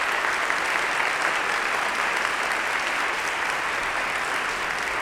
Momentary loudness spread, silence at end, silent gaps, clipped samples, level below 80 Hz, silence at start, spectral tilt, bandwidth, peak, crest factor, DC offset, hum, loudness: 2 LU; 0 s; none; under 0.1%; -56 dBFS; 0 s; -1 dB/octave; over 20 kHz; -6 dBFS; 20 dB; under 0.1%; none; -24 LUFS